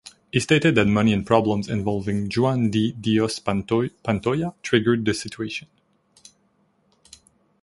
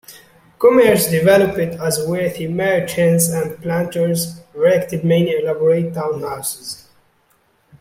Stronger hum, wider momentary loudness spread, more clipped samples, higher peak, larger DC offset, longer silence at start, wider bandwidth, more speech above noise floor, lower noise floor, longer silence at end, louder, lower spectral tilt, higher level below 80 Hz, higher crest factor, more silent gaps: neither; second, 8 LU vs 11 LU; neither; about the same, -2 dBFS vs -2 dBFS; neither; about the same, 0.05 s vs 0.1 s; second, 11.5 kHz vs 16.5 kHz; about the same, 43 dB vs 43 dB; first, -65 dBFS vs -59 dBFS; first, 2.05 s vs 1.05 s; second, -22 LUFS vs -17 LUFS; about the same, -6 dB/octave vs -5 dB/octave; about the same, -50 dBFS vs -54 dBFS; first, 22 dB vs 16 dB; neither